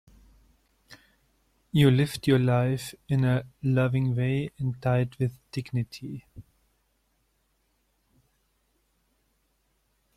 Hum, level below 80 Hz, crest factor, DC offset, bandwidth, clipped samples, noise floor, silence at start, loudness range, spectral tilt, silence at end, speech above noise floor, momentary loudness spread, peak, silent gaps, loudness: none; -58 dBFS; 20 dB; under 0.1%; 14 kHz; under 0.1%; -72 dBFS; 0.9 s; 14 LU; -7.5 dB/octave; 3.75 s; 46 dB; 12 LU; -8 dBFS; none; -26 LUFS